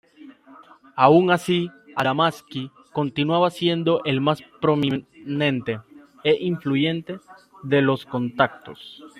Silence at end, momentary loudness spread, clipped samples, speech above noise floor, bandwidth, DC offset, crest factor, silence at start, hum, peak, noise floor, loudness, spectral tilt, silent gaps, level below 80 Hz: 0.1 s; 14 LU; under 0.1%; 27 dB; 14.5 kHz; under 0.1%; 22 dB; 0.25 s; none; -2 dBFS; -49 dBFS; -22 LUFS; -6.5 dB/octave; none; -64 dBFS